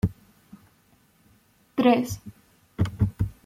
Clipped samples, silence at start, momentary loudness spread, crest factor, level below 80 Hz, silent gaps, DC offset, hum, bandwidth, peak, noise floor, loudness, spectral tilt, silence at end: under 0.1%; 0.05 s; 20 LU; 22 dB; -44 dBFS; none; under 0.1%; none; 15.5 kHz; -6 dBFS; -62 dBFS; -25 LUFS; -7 dB/octave; 0.15 s